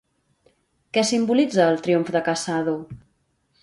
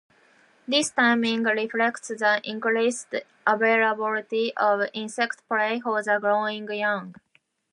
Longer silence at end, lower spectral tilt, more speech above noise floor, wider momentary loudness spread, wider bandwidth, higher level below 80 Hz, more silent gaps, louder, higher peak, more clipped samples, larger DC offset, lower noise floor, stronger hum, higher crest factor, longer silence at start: about the same, 0.65 s vs 0.6 s; first, -4.5 dB/octave vs -3 dB/octave; first, 47 dB vs 35 dB; about the same, 8 LU vs 8 LU; about the same, 11.5 kHz vs 11.5 kHz; first, -62 dBFS vs -78 dBFS; neither; first, -21 LUFS vs -24 LUFS; about the same, -4 dBFS vs -6 dBFS; neither; neither; first, -68 dBFS vs -59 dBFS; neither; about the same, 20 dB vs 18 dB; first, 0.95 s vs 0.7 s